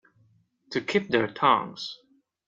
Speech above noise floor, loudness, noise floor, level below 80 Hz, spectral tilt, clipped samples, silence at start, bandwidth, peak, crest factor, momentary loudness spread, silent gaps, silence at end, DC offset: 39 dB; -26 LUFS; -64 dBFS; -68 dBFS; -5 dB/octave; under 0.1%; 0.7 s; 7.8 kHz; -8 dBFS; 22 dB; 15 LU; none; 0.55 s; under 0.1%